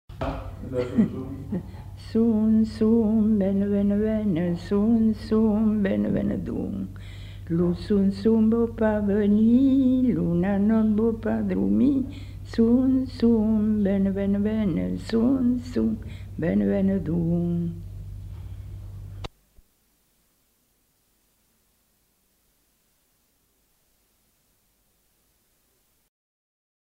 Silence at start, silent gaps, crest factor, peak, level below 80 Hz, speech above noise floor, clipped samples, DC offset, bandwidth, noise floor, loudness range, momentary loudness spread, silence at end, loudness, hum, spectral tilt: 0.1 s; none; 16 dB; -8 dBFS; -44 dBFS; 46 dB; under 0.1%; under 0.1%; 8.4 kHz; -68 dBFS; 7 LU; 19 LU; 7.6 s; -23 LUFS; none; -9.5 dB/octave